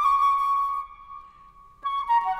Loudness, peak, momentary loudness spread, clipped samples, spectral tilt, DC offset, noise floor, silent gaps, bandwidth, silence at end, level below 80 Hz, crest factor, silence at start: -24 LUFS; -12 dBFS; 23 LU; under 0.1%; -1 dB/octave; under 0.1%; -51 dBFS; none; 13.5 kHz; 0 s; -56 dBFS; 12 dB; 0 s